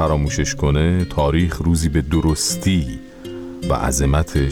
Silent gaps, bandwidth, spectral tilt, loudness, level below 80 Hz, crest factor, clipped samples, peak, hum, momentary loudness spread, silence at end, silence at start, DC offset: none; 17.5 kHz; -5.5 dB/octave; -19 LUFS; -26 dBFS; 10 dB; under 0.1%; -8 dBFS; none; 12 LU; 0 s; 0 s; under 0.1%